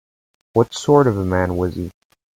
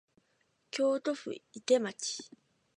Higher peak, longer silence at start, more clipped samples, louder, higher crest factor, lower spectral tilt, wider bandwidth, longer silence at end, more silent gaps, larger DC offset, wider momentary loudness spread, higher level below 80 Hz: first, 0 dBFS vs -14 dBFS; second, 0.55 s vs 0.75 s; neither; first, -18 LUFS vs -33 LUFS; about the same, 18 dB vs 20 dB; first, -6.5 dB/octave vs -3 dB/octave; first, 16 kHz vs 10.5 kHz; about the same, 0.45 s vs 0.5 s; neither; neither; about the same, 12 LU vs 13 LU; first, -50 dBFS vs -88 dBFS